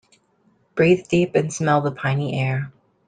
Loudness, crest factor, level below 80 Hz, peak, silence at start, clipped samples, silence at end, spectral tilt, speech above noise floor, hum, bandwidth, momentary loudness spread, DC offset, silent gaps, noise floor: -21 LUFS; 16 dB; -56 dBFS; -4 dBFS; 0.75 s; under 0.1%; 0.4 s; -6.5 dB/octave; 42 dB; none; 9.4 kHz; 9 LU; under 0.1%; none; -62 dBFS